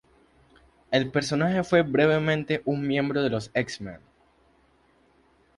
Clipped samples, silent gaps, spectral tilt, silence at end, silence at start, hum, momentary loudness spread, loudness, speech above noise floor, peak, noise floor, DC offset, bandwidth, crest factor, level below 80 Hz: under 0.1%; none; -6 dB/octave; 1.6 s; 0.9 s; none; 7 LU; -25 LUFS; 38 dB; -6 dBFS; -62 dBFS; under 0.1%; 11.5 kHz; 20 dB; -58 dBFS